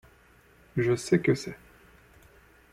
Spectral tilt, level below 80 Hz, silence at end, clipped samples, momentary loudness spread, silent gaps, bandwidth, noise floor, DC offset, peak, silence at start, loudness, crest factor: -6.5 dB/octave; -60 dBFS; 1.15 s; under 0.1%; 16 LU; none; 14.5 kHz; -59 dBFS; under 0.1%; -10 dBFS; 0.75 s; -27 LUFS; 20 dB